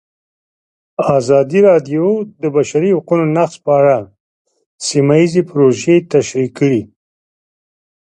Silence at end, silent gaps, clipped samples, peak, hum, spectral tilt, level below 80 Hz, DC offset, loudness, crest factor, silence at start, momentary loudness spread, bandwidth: 1.35 s; 4.20-4.45 s, 4.66-4.78 s; under 0.1%; 0 dBFS; none; -6.5 dB/octave; -56 dBFS; under 0.1%; -13 LUFS; 14 dB; 1 s; 8 LU; 10.5 kHz